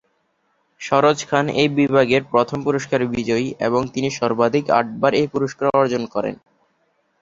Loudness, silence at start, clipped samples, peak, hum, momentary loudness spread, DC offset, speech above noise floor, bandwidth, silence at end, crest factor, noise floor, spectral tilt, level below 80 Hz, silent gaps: -19 LUFS; 0.8 s; under 0.1%; -2 dBFS; none; 6 LU; under 0.1%; 48 dB; 7.8 kHz; 0.85 s; 18 dB; -67 dBFS; -5.5 dB/octave; -56 dBFS; none